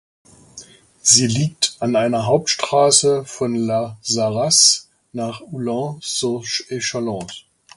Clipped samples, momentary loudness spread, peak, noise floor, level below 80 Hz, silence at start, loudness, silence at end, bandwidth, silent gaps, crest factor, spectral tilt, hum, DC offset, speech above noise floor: under 0.1%; 15 LU; 0 dBFS; -43 dBFS; -58 dBFS; 0.55 s; -17 LUFS; 0.4 s; 11.5 kHz; none; 20 dB; -3 dB/octave; none; under 0.1%; 25 dB